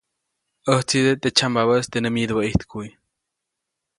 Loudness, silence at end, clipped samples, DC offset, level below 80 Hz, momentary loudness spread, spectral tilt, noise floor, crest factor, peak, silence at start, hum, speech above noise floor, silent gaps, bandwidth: -20 LUFS; 1.1 s; under 0.1%; under 0.1%; -44 dBFS; 14 LU; -4.5 dB/octave; -81 dBFS; 22 dB; -2 dBFS; 0.65 s; none; 61 dB; none; 11.5 kHz